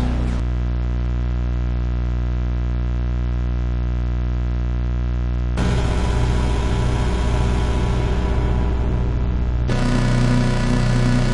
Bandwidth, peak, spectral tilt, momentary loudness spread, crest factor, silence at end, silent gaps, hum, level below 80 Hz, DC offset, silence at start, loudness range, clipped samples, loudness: 10.5 kHz; -6 dBFS; -7 dB/octave; 5 LU; 12 dB; 0 s; none; 60 Hz at -20 dBFS; -20 dBFS; under 0.1%; 0 s; 3 LU; under 0.1%; -21 LUFS